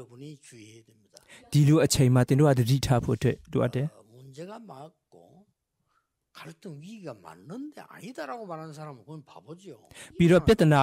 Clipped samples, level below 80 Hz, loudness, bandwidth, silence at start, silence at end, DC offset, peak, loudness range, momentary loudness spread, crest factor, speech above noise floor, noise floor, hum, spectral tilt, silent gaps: under 0.1%; -50 dBFS; -24 LUFS; 16 kHz; 0 s; 0 s; under 0.1%; -12 dBFS; 21 LU; 25 LU; 16 dB; 48 dB; -75 dBFS; none; -6.5 dB/octave; none